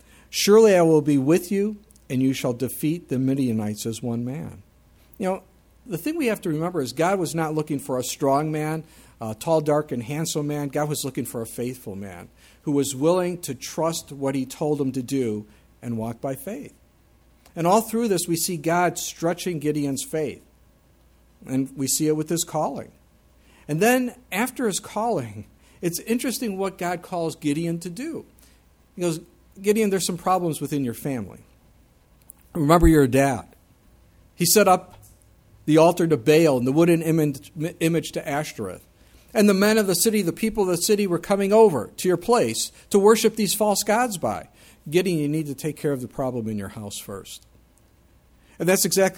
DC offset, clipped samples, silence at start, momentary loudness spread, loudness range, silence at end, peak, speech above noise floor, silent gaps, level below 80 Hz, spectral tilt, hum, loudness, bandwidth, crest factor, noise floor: under 0.1%; under 0.1%; 0.3 s; 15 LU; 8 LU; 0 s; -2 dBFS; 35 dB; none; -44 dBFS; -5 dB/octave; none; -23 LUFS; 19 kHz; 20 dB; -57 dBFS